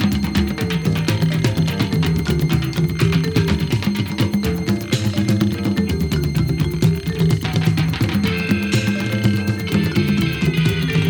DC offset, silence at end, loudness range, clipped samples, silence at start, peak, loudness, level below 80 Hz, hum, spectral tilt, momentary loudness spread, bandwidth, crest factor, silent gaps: under 0.1%; 0 s; 1 LU; under 0.1%; 0 s; -2 dBFS; -19 LUFS; -34 dBFS; none; -6.5 dB/octave; 2 LU; over 20 kHz; 16 dB; none